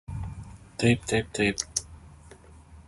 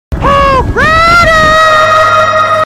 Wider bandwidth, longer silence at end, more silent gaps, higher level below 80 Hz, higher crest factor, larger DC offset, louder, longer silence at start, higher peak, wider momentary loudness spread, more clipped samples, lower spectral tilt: second, 11.5 kHz vs 16 kHz; about the same, 0.05 s vs 0 s; neither; second, -46 dBFS vs -20 dBFS; first, 24 dB vs 6 dB; neither; second, -27 LUFS vs -5 LUFS; about the same, 0.1 s vs 0.1 s; second, -6 dBFS vs 0 dBFS; first, 18 LU vs 4 LU; neither; about the same, -4.5 dB/octave vs -4.5 dB/octave